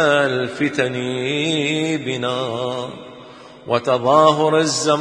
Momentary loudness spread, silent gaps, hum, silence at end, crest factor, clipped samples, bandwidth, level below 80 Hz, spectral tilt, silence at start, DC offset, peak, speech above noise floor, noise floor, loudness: 13 LU; none; none; 0 s; 18 dB; under 0.1%; 10.5 kHz; -62 dBFS; -4 dB/octave; 0 s; under 0.1%; 0 dBFS; 22 dB; -40 dBFS; -18 LUFS